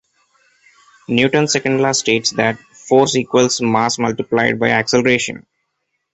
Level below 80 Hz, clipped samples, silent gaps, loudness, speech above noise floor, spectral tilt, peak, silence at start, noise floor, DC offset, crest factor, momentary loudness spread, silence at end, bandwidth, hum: -54 dBFS; under 0.1%; none; -15 LUFS; 57 dB; -3.5 dB/octave; -2 dBFS; 1.1 s; -72 dBFS; under 0.1%; 16 dB; 5 LU; 0.75 s; 8.2 kHz; none